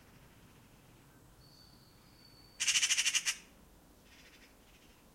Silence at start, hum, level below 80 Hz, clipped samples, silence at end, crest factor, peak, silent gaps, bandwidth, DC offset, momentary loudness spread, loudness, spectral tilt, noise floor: 2.6 s; none; -68 dBFS; under 0.1%; 1.75 s; 24 dB; -16 dBFS; none; 16.5 kHz; under 0.1%; 9 LU; -31 LUFS; 2 dB/octave; -61 dBFS